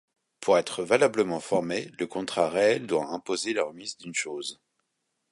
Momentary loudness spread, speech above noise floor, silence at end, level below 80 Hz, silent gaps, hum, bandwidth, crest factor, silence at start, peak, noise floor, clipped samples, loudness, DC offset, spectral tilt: 10 LU; 52 dB; 0.8 s; -70 dBFS; none; none; 11.5 kHz; 22 dB; 0.4 s; -6 dBFS; -79 dBFS; under 0.1%; -27 LUFS; under 0.1%; -3.5 dB/octave